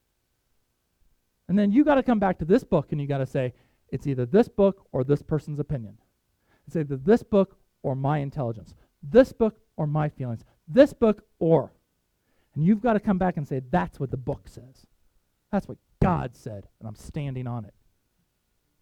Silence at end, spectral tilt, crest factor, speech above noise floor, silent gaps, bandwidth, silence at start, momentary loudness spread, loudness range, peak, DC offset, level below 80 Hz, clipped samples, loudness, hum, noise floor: 1.15 s; -9 dB/octave; 24 dB; 50 dB; none; 12 kHz; 1.5 s; 17 LU; 8 LU; -2 dBFS; under 0.1%; -48 dBFS; under 0.1%; -25 LUFS; none; -74 dBFS